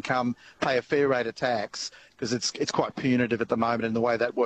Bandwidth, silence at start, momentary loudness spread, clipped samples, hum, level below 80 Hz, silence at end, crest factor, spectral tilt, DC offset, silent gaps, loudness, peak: 8.6 kHz; 0.05 s; 8 LU; under 0.1%; none; -62 dBFS; 0 s; 16 dB; -4.5 dB/octave; under 0.1%; none; -27 LUFS; -10 dBFS